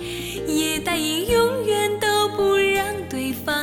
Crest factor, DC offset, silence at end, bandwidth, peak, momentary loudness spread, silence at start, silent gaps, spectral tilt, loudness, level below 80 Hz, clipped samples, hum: 14 dB; under 0.1%; 0 s; 17.5 kHz; -8 dBFS; 8 LU; 0 s; none; -3 dB/octave; -21 LUFS; -44 dBFS; under 0.1%; none